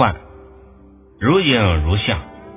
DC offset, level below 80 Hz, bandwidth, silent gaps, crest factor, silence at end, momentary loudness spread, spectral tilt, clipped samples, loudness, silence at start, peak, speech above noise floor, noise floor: under 0.1%; -28 dBFS; 3.9 kHz; none; 18 dB; 0 s; 10 LU; -10 dB/octave; under 0.1%; -17 LUFS; 0 s; 0 dBFS; 30 dB; -45 dBFS